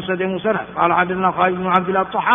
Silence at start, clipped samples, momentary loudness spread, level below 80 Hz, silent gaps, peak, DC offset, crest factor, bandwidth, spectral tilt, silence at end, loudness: 0 s; under 0.1%; 5 LU; -52 dBFS; none; 0 dBFS; under 0.1%; 18 dB; 3.8 kHz; -4 dB/octave; 0 s; -18 LUFS